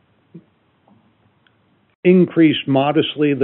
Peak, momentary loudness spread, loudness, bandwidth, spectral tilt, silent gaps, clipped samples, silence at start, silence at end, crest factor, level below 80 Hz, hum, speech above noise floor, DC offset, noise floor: -2 dBFS; 5 LU; -15 LUFS; 4.1 kHz; -5.5 dB/octave; 1.95-2.03 s; under 0.1%; 0.35 s; 0 s; 16 dB; -68 dBFS; none; 44 dB; under 0.1%; -59 dBFS